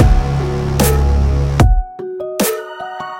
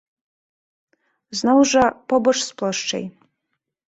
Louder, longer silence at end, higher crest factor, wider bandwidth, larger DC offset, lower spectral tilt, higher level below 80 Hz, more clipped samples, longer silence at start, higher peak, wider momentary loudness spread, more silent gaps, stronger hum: first, -16 LUFS vs -19 LUFS; second, 0 s vs 0.85 s; about the same, 14 dB vs 18 dB; first, 17 kHz vs 8.2 kHz; neither; first, -6 dB/octave vs -3 dB/octave; first, -16 dBFS vs -56 dBFS; neither; second, 0 s vs 1.3 s; first, 0 dBFS vs -4 dBFS; about the same, 12 LU vs 14 LU; neither; neither